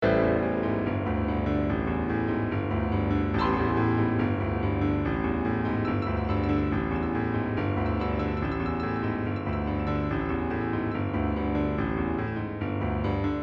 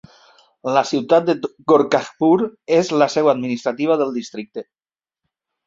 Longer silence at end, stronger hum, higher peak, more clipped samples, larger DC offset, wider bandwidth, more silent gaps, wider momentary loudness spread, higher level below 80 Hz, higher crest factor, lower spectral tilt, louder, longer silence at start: second, 0 s vs 1.05 s; neither; second, -10 dBFS vs -2 dBFS; neither; neither; second, 5.8 kHz vs 7.8 kHz; neither; second, 4 LU vs 14 LU; first, -40 dBFS vs -64 dBFS; about the same, 16 dB vs 18 dB; first, -9.5 dB/octave vs -5.5 dB/octave; second, -28 LUFS vs -18 LUFS; second, 0 s vs 0.65 s